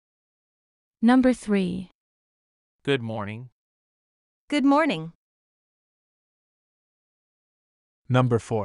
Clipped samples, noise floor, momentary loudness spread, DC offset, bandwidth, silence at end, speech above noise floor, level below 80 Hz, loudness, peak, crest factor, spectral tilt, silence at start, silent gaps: under 0.1%; under -90 dBFS; 16 LU; under 0.1%; 11.5 kHz; 0 s; over 68 dB; -60 dBFS; -23 LUFS; -8 dBFS; 20 dB; -7 dB/octave; 1 s; 1.95-2.79 s, 3.52-4.48 s, 5.15-8.05 s